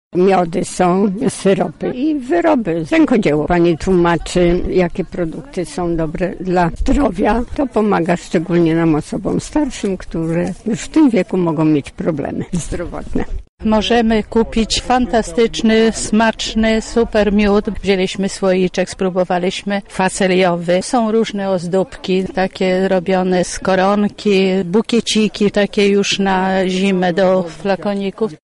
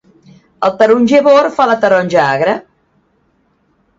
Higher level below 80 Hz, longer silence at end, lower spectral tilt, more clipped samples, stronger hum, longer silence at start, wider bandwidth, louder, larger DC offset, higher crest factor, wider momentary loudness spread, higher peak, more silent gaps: first, -32 dBFS vs -56 dBFS; second, 0.1 s vs 1.35 s; about the same, -5.5 dB/octave vs -5.5 dB/octave; neither; neither; second, 0.15 s vs 0.6 s; first, 11.5 kHz vs 7.8 kHz; second, -16 LUFS vs -11 LUFS; neither; about the same, 12 dB vs 12 dB; about the same, 8 LU vs 9 LU; about the same, -2 dBFS vs 0 dBFS; first, 13.49-13.58 s vs none